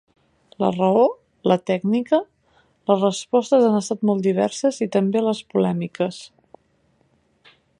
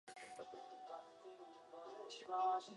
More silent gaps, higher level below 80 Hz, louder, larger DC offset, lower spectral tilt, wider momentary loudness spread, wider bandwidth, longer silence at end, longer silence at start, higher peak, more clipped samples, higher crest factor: neither; first, -68 dBFS vs under -90 dBFS; first, -21 LUFS vs -48 LUFS; neither; first, -6 dB/octave vs -2.5 dB/octave; second, 9 LU vs 18 LU; about the same, 11 kHz vs 11.5 kHz; first, 1.55 s vs 0 s; first, 0.6 s vs 0.05 s; first, -4 dBFS vs -30 dBFS; neither; about the same, 18 dB vs 18 dB